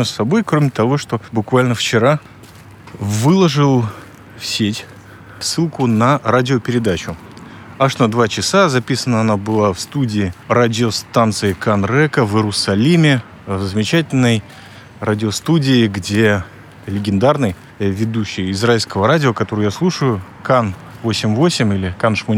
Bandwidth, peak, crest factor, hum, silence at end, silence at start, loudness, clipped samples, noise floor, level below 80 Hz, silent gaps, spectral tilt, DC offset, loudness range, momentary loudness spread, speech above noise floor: 16.5 kHz; 0 dBFS; 14 dB; none; 0 s; 0 s; -16 LUFS; under 0.1%; -39 dBFS; -50 dBFS; none; -5.5 dB/octave; under 0.1%; 2 LU; 9 LU; 24 dB